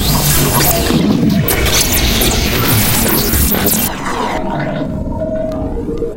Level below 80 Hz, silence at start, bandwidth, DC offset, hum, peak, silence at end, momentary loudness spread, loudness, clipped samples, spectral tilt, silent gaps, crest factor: -22 dBFS; 0 s; 17.5 kHz; 1%; none; 0 dBFS; 0 s; 9 LU; -13 LUFS; under 0.1%; -4 dB/octave; none; 14 dB